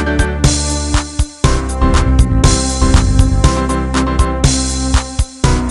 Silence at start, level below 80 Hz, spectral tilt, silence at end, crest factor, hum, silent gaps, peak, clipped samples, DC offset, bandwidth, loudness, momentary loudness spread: 0 s; -14 dBFS; -4.5 dB/octave; 0 s; 12 dB; none; none; 0 dBFS; 0.1%; under 0.1%; 11.5 kHz; -14 LUFS; 5 LU